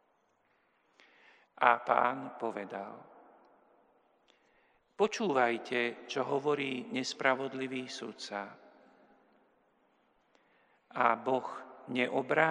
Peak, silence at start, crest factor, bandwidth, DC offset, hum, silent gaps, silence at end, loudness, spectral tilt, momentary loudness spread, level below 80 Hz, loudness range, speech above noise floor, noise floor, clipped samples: -8 dBFS; 1.6 s; 28 dB; 10.5 kHz; under 0.1%; none; none; 0 s; -33 LUFS; -4.5 dB/octave; 14 LU; -88 dBFS; 8 LU; 41 dB; -73 dBFS; under 0.1%